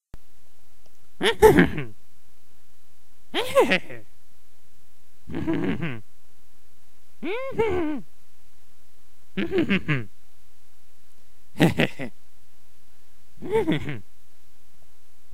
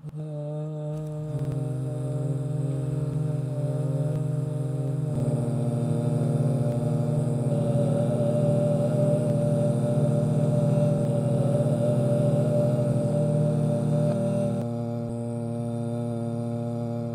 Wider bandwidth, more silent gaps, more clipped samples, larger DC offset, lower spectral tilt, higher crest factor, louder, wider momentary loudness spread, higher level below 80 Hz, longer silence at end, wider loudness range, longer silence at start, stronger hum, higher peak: first, 16 kHz vs 11.5 kHz; neither; neither; first, 4% vs under 0.1%; second, -6 dB/octave vs -9 dB/octave; first, 26 dB vs 14 dB; about the same, -24 LUFS vs -26 LUFS; first, 21 LU vs 7 LU; first, -48 dBFS vs -54 dBFS; first, 1.3 s vs 0 s; first, 9 LU vs 5 LU; about the same, 0 s vs 0.05 s; neither; first, 0 dBFS vs -10 dBFS